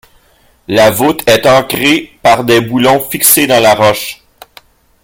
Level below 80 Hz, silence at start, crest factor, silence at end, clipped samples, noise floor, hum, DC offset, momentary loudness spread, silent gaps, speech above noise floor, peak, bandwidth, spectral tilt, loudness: -44 dBFS; 0.7 s; 10 dB; 0.9 s; 0.3%; -49 dBFS; none; under 0.1%; 5 LU; none; 40 dB; 0 dBFS; over 20 kHz; -3.5 dB/octave; -9 LUFS